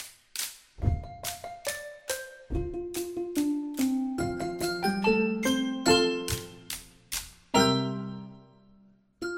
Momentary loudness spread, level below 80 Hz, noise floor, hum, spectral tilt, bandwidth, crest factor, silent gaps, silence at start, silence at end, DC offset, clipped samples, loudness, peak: 14 LU; -44 dBFS; -60 dBFS; none; -4 dB/octave; 17 kHz; 22 dB; none; 0 s; 0 s; under 0.1%; under 0.1%; -30 LUFS; -8 dBFS